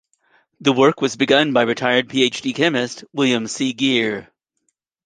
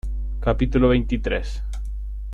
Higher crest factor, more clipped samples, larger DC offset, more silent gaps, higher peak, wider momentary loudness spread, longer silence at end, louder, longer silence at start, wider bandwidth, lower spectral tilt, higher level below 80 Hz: about the same, 18 dB vs 16 dB; neither; neither; neither; first, -2 dBFS vs -6 dBFS; second, 8 LU vs 14 LU; first, 0.85 s vs 0 s; first, -18 LUFS vs -23 LUFS; first, 0.6 s vs 0.05 s; first, 9.8 kHz vs 7.4 kHz; second, -4 dB/octave vs -8 dB/octave; second, -64 dBFS vs -26 dBFS